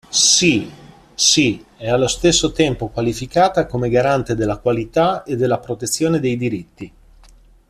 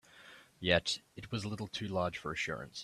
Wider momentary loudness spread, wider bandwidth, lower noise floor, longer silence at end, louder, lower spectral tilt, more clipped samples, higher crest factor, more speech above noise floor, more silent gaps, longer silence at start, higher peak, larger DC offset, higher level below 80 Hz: second, 12 LU vs 19 LU; about the same, 14 kHz vs 13.5 kHz; second, -47 dBFS vs -58 dBFS; first, 0.8 s vs 0 s; first, -17 LUFS vs -36 LUFS; about the same, -3.5 dB/octave vs -4 dB/octave; neither; second, 18 dB vs 24 dB; first, 30 dB vs 21 dB; neither; about the same, 0.1 s vs 0.15 s; first, 0 dBFS vs -12 dBFS; neither; first, -42 dBFS vs -64 dBFS